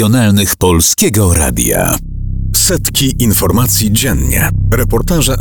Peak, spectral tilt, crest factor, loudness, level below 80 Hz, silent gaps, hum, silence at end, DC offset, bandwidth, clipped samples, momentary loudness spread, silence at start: 0 dBFS; -4 dB/octave; 10 dB; -11 LUFS; -20 dBFS; none; none; 0 s; 0.7%; over 20 kHz; under 0.1%; 4 LU; 0 s